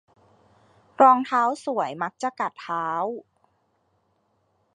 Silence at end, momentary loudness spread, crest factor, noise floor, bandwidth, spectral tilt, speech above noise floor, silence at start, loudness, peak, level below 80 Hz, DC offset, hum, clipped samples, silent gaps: 1.55 s; 13 LU; 22 dB; -69 dBFS; 10 kHz; -5 dB/octave; 47 dB; 1 s; -23 LUFS; -4 dBFS; -78 dBFS; under 0.1%; none; under 0.1%; none